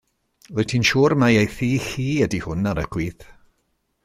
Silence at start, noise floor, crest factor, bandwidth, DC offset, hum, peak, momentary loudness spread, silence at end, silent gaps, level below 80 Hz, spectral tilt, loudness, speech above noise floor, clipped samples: 0.5 s; -70 dBFS; 18 dB; 15 kHz; under 0.1%; none; -4 dBFS; 11 LU; 0.8 s; none; -44 dBFS; -5.5 dB/octave; -21 LUFS; 50 dB; under 0.1%